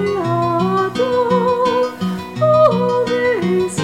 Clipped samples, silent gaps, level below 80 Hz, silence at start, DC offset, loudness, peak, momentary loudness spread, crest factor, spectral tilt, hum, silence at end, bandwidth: under 0.1%; none; -52 dBFS; 0 s; 0.2%; -16 LUFS; -2 dBFS; 6 LU; 14 dB; -6.5 dB/octave; none; 0 s; 15.5 kHz